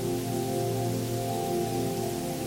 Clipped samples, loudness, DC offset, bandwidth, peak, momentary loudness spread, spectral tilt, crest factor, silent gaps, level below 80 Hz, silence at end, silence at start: under 0.1%; -30 LUFS; under 0.1%; 17 kHz; -18 dBFS; 1 LU; -5.5 dB/octave; 12 dB; none; -54 dBFS; 0 s; 0 s